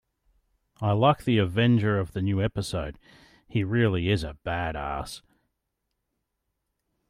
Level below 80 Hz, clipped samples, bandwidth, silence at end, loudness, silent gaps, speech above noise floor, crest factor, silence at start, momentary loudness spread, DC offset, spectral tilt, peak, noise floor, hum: -48 dBFS; under 0.1%; 14 kHz; 1.9 s; -26 LUFS; none; 55 dB; 20 dB; 0.8 s; 11 LU; under 0.1%; -7 dB/octave; -8 dBFS; -80 dBFS; none